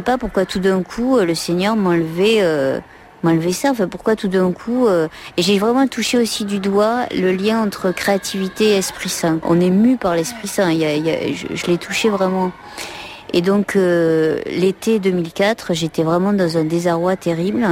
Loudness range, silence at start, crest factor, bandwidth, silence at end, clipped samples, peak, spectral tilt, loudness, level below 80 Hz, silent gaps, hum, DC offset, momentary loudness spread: 1 LU; 0 s; 14 dB; 16.5 kHz; 0 s; under 0.1%; -4 dBFS; -5 dB/octave; -17 LUFS; -48 dBFS; none; none; under 0.1%; 6 LU